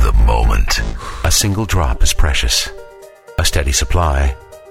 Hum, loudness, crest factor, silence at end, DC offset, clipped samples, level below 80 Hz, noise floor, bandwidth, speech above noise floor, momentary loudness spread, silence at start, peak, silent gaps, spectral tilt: none; -16 LUFS; 14 dB; 0.15 s; under 0.1%; under 0.1%; -16 dBFS; -38 dBFS; 16.5 kHz; 24 dB; 10 LU; 0 s; -2 dBFS; none; -3.5 dB/octave